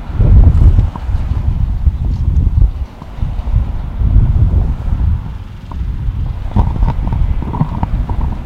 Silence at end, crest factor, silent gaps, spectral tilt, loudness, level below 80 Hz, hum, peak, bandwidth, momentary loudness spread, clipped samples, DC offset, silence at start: 0 s; 12 dB; none; -9.5 dB/octave; -15 LUFS; -14 dBFS; none; 0 dBFS; 4.5 kHz; 12 LU; 0.4%; under 0.1%; 0 s